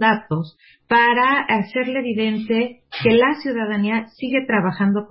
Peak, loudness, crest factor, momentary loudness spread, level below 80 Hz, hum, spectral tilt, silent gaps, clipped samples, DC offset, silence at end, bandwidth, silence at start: -2 dBFS; -19 LUFS; 16 dB; 8 LU; -56 dBFS; none; -11 dB/octave; none; under 0.1%; under 0.1%; 0.05 s; 5.8 kHz; 0 s